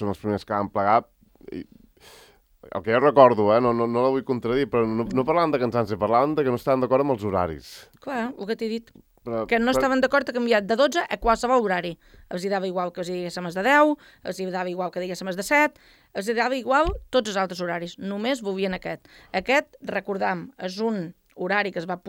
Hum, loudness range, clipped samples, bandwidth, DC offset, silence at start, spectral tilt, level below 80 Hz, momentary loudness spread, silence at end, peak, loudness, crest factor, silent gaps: none; 6 LU; under 0.1%; 16.5 kHz; under 0.1%; 0 s; -5.5 dB/octave; -48 dBFS; 12 LU; 0 s; 0 dBFS; -23 LUFS; 24 dB; none